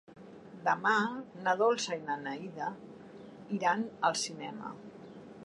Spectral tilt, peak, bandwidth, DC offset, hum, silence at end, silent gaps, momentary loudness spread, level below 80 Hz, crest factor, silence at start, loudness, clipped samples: -3.5 dB/octave; -14 dBFS; 11 kHz; under 0.1%; none; 0 s; none; 22 LU; -78 dBFS; 20 dB; 0.1 s; -33 LUFS; under 0.1%